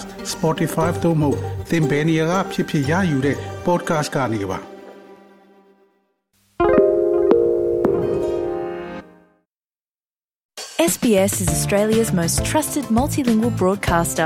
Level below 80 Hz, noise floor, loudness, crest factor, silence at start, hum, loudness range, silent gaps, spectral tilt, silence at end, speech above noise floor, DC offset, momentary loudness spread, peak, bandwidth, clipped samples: -40 dBFS; under -90 dBFS; -19 LUFS; 18 dB; 0 s; none; 6 LU; 10.45-10.49 s; -5.5 dB/octave; 0 s; over 71 dB; under 0.1%; 11 LU; -2 dBFS; 16.5 kHz; under 0.1%